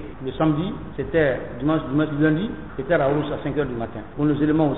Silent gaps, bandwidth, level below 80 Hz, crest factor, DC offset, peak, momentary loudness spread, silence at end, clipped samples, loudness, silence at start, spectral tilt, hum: none; 4.1 kHz; -42 dBFS; 16 dB; 0.9%; -6 dBFS; 10 LU; 0 s; under 0.1%; -23 LUFS; 0 s; -6.5 dB/octave; none